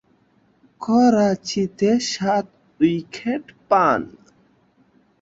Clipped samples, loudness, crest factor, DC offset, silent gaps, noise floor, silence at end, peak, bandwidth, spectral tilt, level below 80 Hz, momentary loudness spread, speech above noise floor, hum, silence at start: under 0.1%; -20 LUFS; 18 dB; under 0.1%; none; -60 dBFS; 1.15 s; -4 dBFS; 7.8 kHz; -5.5 dB/octave; -60 dBFS; 12 LU; 41 dB; none; 0.8 s